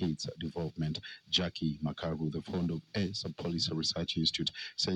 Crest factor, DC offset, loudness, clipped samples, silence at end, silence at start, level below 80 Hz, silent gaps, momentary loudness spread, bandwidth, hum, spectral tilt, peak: 20 dB; under 0.1%; -34 LUFS; under 0.1%; 0 s; 0 s; -58 dBFS; none; 7 LU; 10 kHz; none; -5 dB/octave; -16 dBFS